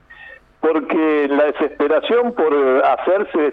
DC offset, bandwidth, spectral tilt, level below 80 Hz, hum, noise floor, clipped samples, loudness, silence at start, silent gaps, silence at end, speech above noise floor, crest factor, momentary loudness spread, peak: under 0.1%; 4.6 kHz; -7 dB/octave; -56 dBFS; none; -42 dBFS; under 0.1%; -17 LUFS; 0.1 s; none; 0 s; 26 dB; 12 dB; 4 LU; -6 dBFS